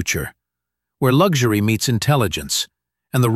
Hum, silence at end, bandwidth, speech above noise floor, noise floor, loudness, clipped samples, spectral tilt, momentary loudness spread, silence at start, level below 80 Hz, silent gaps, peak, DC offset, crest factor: none; 0 s; 15 kHz; 65 dB; -82 dBFS; -18 LUFS; under 0.1%; -5 dB/octave; 9 LU; 0 s; -44 dBFS; none; -2 dBFS; under 0.1%; 16 dB